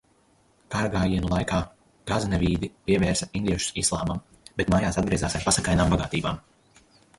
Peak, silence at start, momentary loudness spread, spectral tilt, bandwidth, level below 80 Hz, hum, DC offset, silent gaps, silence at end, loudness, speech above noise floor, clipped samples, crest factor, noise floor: -8 dBFS; 0.7 s; 9 LU; -4.5 dB/octave; 11.5 kHz; -38 dBFS; none; under 0.1%; none; 0.8 s; -25 LUFS; 38 dB; under 0.1%; 18 dB; -62 dBFS